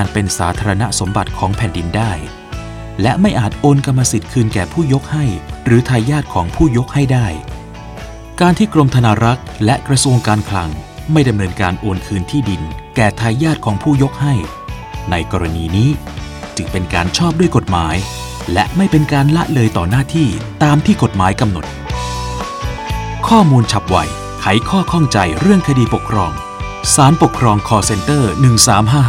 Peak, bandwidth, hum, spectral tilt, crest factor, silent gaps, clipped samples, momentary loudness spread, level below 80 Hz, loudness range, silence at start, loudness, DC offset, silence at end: 0 dBFS; 16 kHz; none; -5.5 dB/octave; 14 dB; none; under 0.1%; 12 LU; -30 dBFS; 4 LU; 0 s; -14 LUFS; under 0.1%; 0 s